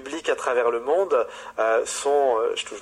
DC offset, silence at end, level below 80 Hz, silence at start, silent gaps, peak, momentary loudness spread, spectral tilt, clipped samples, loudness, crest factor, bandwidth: under 0.1%; 0 s; -64 dBFS; 0 s; none; -10 dBFS; 5 LU; -1.5 dB/octave; under 0.1%; -23 LUFS; 14 dB; 13 kHz